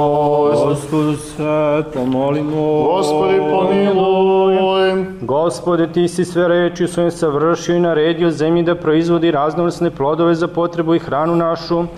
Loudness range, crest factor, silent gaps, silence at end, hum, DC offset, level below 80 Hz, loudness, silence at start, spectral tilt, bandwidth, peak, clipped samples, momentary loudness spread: 2 LU; 8 dB; none; 0 s; none; 0.2%; -48 dBFS; -15 LUFS; 0 s; -6.5 dB/octave; 12.5 kHz; -6 dBFS; under 0.1%; 4 LU